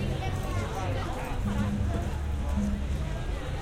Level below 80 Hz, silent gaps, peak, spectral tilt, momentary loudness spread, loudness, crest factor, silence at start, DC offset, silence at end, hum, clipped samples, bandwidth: -34 dBFS; none; -16 dBFS; -6.5 dB/octave; 4 LU; -32 LUFS; 12 dB; 0 s; under 0.1%; 0 s; none; under 0.1%; 15.5 kHz